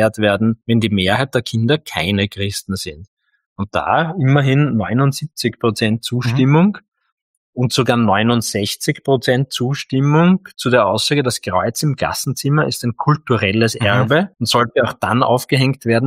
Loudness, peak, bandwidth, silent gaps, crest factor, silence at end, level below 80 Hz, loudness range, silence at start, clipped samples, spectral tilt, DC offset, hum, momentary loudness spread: -16 LUFS; 0 dBFS; 16 kHz; 3.08-3.17 s, 3.46-3.56 s, 6.88-6.92 s, 7.12-7.53 s; 16 dB; 0 s; -52 dBFS; 2 LU; 0 s; under 0.1%; -5.5 dB/octave; under 0.1%; none; 6 LU